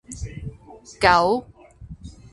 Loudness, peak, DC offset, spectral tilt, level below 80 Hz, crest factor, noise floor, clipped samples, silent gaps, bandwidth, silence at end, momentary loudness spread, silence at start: -19 LUFS; 0 dBFS; under 0.1%; -4.5 dB/octave; -42 dBFS; 24 dB; -42 dBFS; under 0.1%; none; 11.5 kHz; 0.2 s; 25 LU; 0.1 s